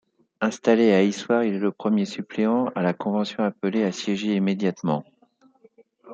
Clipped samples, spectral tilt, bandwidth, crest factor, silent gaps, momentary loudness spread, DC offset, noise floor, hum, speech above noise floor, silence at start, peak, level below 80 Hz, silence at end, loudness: under 0.1%; -6.5 dB/octave; 7.8 kHz; 20 dB; none; 8 LU; under 0.1%; -60 dBFS; none; 37 dB; 0.4 s; -4 dBFS; -72 dBFS; 0 s; -23 LUFS